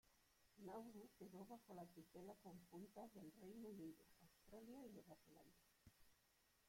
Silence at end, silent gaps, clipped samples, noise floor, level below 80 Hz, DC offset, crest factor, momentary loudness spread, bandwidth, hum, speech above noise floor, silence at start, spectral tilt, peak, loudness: 0 s; none; under 0.1%; -81 dBFS; -84 dBFS; under 0.1%; 16 dB; 7 LU; 16.5 kHz; none; 20 dB; 0.05 s; -6 dB/octave; -46 dBFS; -62 LUFS